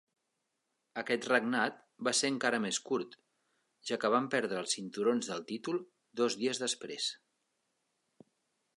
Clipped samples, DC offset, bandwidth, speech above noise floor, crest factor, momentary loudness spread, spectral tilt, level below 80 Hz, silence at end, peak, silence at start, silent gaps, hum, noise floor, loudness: under 0.1%; under 0.1%; 11.5 kHz; 50 dB; 22 dB; 9 LU; -2.5 dB/octave; -86 dBFS; 1.65 s; -14 dBFS; 0.95 s; none; none; -84 dBFS; -33 LUFS